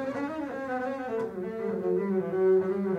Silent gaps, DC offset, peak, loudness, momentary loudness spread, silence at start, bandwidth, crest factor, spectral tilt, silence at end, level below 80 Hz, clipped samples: none; under 0.1%; -16 dBFS; -29 LUFS; 9 LU; 0 s; 6.8 kHz; 12 dB; -8.5 dB/octave; 0 s; -68 dBFS; under 0.1%